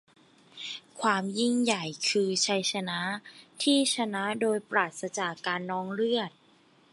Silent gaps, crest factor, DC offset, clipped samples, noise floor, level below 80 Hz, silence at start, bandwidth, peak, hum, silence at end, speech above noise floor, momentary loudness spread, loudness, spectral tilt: none; 20 dB; under 0.1%; under 0.1%; -62 dBFS; -80 dBFS; 0.55 s; 11.5 kHz; -10 dBFS; none; 0.65 s; 33 dB; 10 LU; -28 LUFS; -3 dB/octave